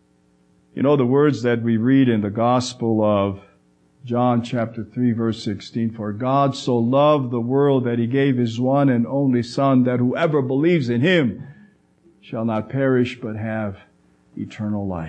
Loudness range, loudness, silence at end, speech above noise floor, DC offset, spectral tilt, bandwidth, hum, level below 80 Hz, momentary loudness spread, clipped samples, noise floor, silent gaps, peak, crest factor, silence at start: 5 LU; -20 LUFS; 0 s; 40 dB; under 0.1%; -7.5 dB/octave; 8.8 kHz; none; -60 dBFS; 10 LU; under 0.1%; -59 dBFS; none; -4 dBFS; 16 dB; 0.75 s